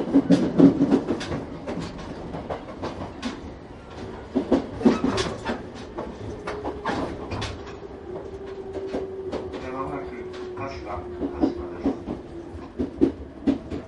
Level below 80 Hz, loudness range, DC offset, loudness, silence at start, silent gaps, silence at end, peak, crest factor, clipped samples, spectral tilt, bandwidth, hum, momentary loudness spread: -44 dBFS; 8 LU; under 0.1%; -27 LUFS; 0 s; none; 0 s; -2 dBFS; 24 dB; under 0.1%; -7 dB/octave; 11 kHz; none; 16 LU